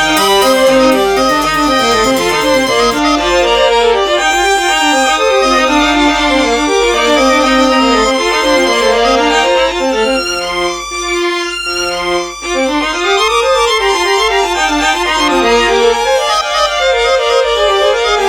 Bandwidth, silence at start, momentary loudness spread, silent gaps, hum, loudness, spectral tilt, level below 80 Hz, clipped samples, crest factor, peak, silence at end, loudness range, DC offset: over 20 kHz; 0 s; 5 LU; none; none; -10 LUFS; -2 dB/octave; -34 dBFS; under 0.1%; 10 dB; 0 dBFS; 0 s; 3 LU; under 0.1%